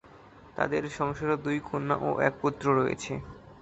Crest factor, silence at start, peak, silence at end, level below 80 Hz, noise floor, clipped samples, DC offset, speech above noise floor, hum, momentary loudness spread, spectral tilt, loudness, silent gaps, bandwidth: 22 dB; 0.05 s; -8 dBFS; 0 s; -56 dBFS; -52 dBFS; under 0.1%; under 0.1%; 24 dB; none; 11 LU; -6.5 dB/octave; -29 LUFS; none; 8.2 kHz